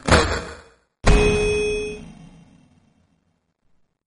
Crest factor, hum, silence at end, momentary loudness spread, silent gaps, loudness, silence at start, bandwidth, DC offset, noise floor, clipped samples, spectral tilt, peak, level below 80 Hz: 22 dB; none; 1.95 s; 21 LU; none; -20 LUFS; 0.05 s; 10.5 kHz; under 0.1%; -69 dBFS; under 0.1%; -4.5 dB/octave; 0 dBFS; -28 dBFS